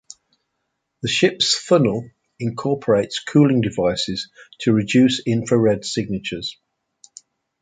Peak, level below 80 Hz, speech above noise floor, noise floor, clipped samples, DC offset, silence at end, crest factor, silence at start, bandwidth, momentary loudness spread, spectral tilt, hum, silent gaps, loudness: -2 dBFS; -54 dBFS; 57 dB; -75 dBFS; under 0.1%; under 0.1%; 1.1 s; 18 dB; 1.05 s; 9.6 kHz; 13 LU; -5 dB/octave; none; none; -19 LUFS